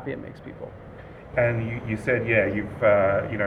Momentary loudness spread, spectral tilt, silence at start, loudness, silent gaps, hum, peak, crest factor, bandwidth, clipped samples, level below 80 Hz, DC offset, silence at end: 20 LU; -8.5 dB/octave; 0 s; -23 LUFS; none; none; -6 dBFS; 20 dB; 11 kHz; under 0.1%; -48 dBFS; under 0.1%; 0 s